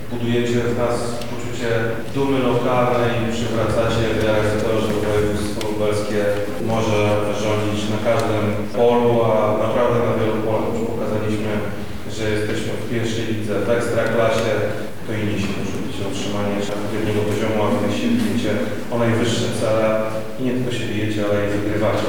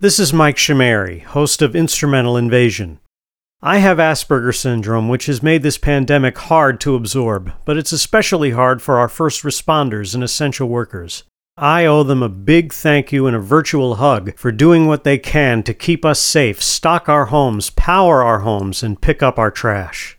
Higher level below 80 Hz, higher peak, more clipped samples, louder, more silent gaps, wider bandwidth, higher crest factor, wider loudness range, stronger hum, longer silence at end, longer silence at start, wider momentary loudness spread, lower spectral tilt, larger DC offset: second, -42 dBFS vs -30 dBFS; second, -6 dBFS vs 0 dBFS; neither; second, -20 LUFS vs -14 LUFS; second, none vs 3.18-3.22 s; about the same, 19.5 kHz vs 20 kHz; about the same, 14 dB vs 14 dB; about the same, 4 LU vs 2 LU; neither; about the same, 0 s vs 0.05 s; about the same, 0 s vs 0 s; about the same, 6 LU vs 8 LU; first, -6 dB/octave vs -4.5 dB/octave; first, 5% vs under 0.1%